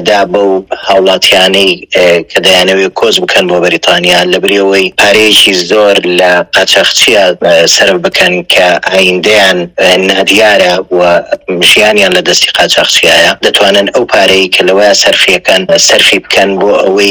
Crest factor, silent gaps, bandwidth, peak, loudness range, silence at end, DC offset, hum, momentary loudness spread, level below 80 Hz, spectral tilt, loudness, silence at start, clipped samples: 6 dB; none; over 20 kHz; 0 dBFS; 1 LU; 0 s; under 0.1%; none; 4 LU; -42 dBFS; -2 dB/octave; -5 LUFS; 0 s; 9%